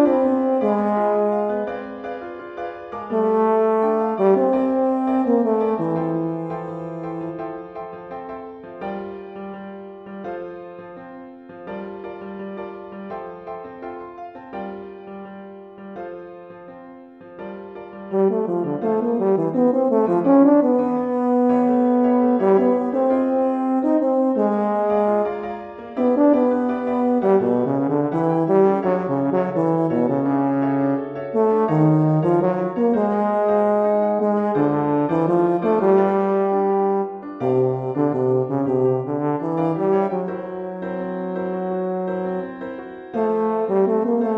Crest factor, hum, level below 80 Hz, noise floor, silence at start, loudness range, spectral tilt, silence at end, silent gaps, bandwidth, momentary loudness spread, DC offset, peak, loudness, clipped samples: 18 dB; none; -62 dBFS; -41 dBFS; 0 s; 16 LU; -10.5 dB/octave; 0 s; none; 5.2 kHz; 18 LU; under 0.1%; -4 dBFS; -20 LUFS; under 0.1%